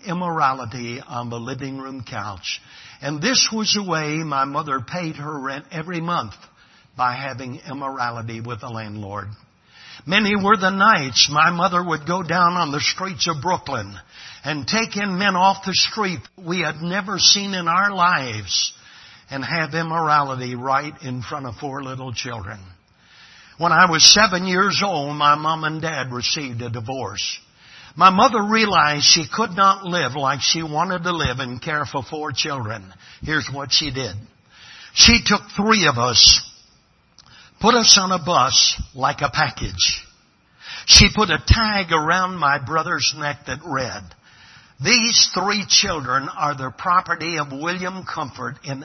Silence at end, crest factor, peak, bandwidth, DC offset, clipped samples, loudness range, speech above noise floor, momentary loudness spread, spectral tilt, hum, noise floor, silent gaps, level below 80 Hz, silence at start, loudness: 0 s; 20 dB; 0 dBFS; 12 kHz; under 0.1%; under 0.1%; 10 LU; 38 dB; 17 LU; -2.5 dB/octave; none; -57 dBFS; none; -40 dBFS; 0.05 s; -17 LUFS